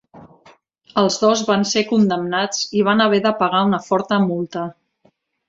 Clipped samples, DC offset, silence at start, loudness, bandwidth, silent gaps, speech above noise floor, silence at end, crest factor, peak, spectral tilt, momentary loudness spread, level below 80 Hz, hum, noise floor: under 0.1%; under 0.1%; 0.15 s; -18 LUFS; 7.8 kHz; none; 43 dB; 0.75 s; 18 dB; -2 dBFS; -4.5 dB/octave; 9 LU; -62 dBFS; none; -60 dBFS